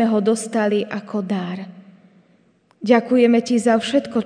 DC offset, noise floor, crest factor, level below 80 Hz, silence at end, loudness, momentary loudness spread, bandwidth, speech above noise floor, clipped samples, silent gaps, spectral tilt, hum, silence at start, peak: under 0.1%; -58 dBFS; 18 dB; -68 dBFS; 0 s; -19 LUFS; 14 LU; 10 kHz; 40 dB; under 0.1%; none; -5.5 dB/octave; none; 0 s; -2 dBFS